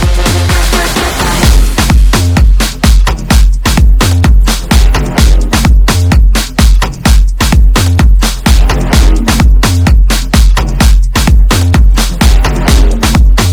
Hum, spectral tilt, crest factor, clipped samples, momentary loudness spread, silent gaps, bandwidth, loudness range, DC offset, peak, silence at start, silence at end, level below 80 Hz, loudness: none; -4.5 dB/octave; 6 dB; 3%; 2 LU; none; 18 kHz; 1 LU; under 0.1%; 0 dBFS; 0 s; 0 s; -6 dBFS; -9 LUFS